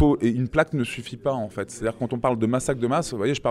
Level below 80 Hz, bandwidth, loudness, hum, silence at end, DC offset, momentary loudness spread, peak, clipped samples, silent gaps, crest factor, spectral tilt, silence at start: -44 dBFS; 13.5 kHz; -25 LUFS; none; 0 s; under 0.1%; 6 LU; -6 dBFS; under 0.1%; none; 18 dB; -6 dB/octave; 0 s